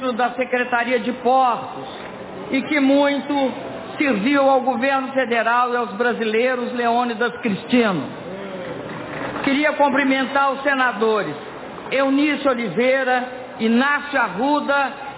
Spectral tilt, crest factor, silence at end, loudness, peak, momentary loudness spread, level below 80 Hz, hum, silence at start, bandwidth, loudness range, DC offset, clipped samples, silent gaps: -9 dB/octave; 14 dB; 0 s; -19 LUFS; -4 dBFS; 14 LU; -60 dBFS; none; 0 s; 4 kHz; 2 LU; under 0.1%; under 0.1%; none